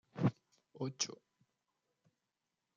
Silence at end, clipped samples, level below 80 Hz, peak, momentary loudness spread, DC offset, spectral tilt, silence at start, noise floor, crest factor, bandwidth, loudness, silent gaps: 1.6 s; under 0.1%; -80 dBFS; -20 dBFS; 9 LU; under 0.1%; -4.5 dB/octave; 0.15 s; -89 dBFS; 24 dB; 9.4 kHz; -40 LUFS; none